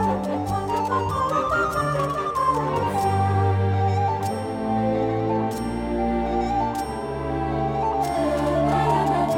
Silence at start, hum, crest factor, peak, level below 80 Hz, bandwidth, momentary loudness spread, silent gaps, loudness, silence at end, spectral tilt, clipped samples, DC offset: 0 s; none; 14 dB; -8 dBFS; -40 dBFS; 17 kHz; 5 LU; none; -23 LUFS; 0 s; -7 dB/octave; under 0.1%; under 0.1%